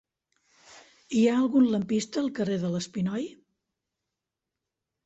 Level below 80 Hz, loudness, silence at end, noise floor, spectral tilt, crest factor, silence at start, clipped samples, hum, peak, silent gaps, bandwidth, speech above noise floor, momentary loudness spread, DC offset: -68 dBFS; -27 LUFS; 1.7 s; -87 dBFS; -6 dB/octave; 16 dB; 0.7 s; under 0.1%; none; -12 dBFS; none; 8.2 kHz; 61 dB; 8 LU; under 0.1%